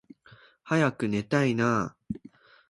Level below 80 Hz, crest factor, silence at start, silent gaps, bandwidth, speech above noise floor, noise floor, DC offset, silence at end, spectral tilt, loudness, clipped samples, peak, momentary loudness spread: -60 dBFS; 18 dB; 0.65 s; none; 11.5 kHz; 31 dB; -56 dBFS; under 0.1%; 0.55 s; -6.5 dB/octave; -27 LUFS; under 0.1%; -10 dBFS; 15 LU